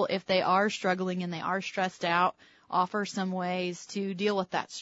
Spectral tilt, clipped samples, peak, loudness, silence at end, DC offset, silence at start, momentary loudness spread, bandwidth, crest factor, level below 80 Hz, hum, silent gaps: -5 dB/octave; under 0.1%; -12 dBFS; -30 LUFS; 0 s; under 0.1%; 0 s; 7 LU; 8 kHz; 18 dB; -76 dBFS; none; none